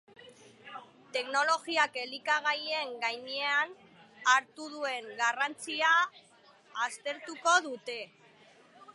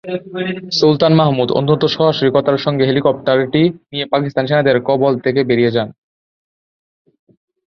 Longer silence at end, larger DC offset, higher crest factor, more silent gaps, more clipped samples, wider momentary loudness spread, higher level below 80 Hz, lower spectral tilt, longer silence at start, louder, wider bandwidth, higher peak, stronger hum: second, 0.05 s vs 1.8 s; neither; first, 22 dB vs 16 dB; neither; neither; first, 15 LU vs 9 LU; second, under -90 dBFS vs -54 dBFS; second, 0 dB/octave vs -7 dB/octave; first, 0.2 s vs 0.05 s; second, -30 LUFS vs -15 LUFS; first, 11.5 kHz vs 6.8 kHz; second, -10 dBFS vs 0 dBFS; neither